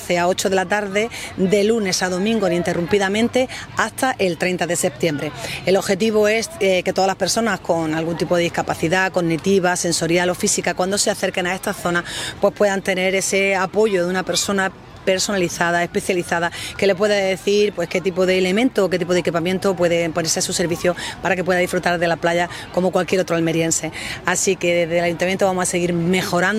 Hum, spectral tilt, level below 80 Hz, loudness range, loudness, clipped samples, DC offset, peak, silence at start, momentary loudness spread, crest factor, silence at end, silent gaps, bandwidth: none; -4 dB/octave; -50 dBFS; 1 LU; -19 LUFS; under 0.1%; under 0.1%; 0 dBFS; 0 s; 4 LU; 18 dB; 0 s; none; 16 kHz